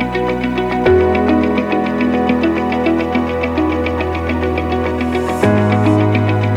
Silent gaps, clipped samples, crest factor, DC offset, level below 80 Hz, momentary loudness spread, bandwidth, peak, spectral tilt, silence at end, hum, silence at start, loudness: none; under 0.1%; 14 dB; under 0.1%; -32 dBFS; 5 LU; 13 kHz; 0 dBFS; -8 dB/octave; 0 s; none; 0 s; -15 LUFS